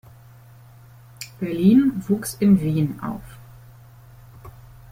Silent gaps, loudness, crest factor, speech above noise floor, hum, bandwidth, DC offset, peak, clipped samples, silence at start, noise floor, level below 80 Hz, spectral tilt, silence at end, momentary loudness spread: none; -20 LUFS; 18 dB; 28 dB; none; 16 kHz; under 0.1%; -4 dBFS; under 0.1%; 1.2 s; -47 dBFS; -52 dBFS; -7.5 dB/octave; 0.4 s; 19 LU